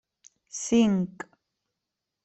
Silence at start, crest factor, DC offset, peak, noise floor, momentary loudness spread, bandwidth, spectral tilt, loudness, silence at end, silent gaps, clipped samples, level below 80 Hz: 0.55 s; 18 dB; under 0.1%; -10 dBFS; -85 dBFS; 21 LU; 8.4 kHz; -5 dB/octave; -25 LUFS; 1.15 s; none; under 0.1%; -64 dBFS